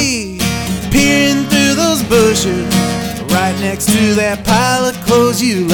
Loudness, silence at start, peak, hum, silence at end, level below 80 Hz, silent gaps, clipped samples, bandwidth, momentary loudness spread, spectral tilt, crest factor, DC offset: -13 LUFS; 0 s; 0 dBFS; none; 0 s; -32 dBFS; none; under 0.1%; 17.5 kHz; 6 LU; -4 dB/octave; 12 dB; under 0.1%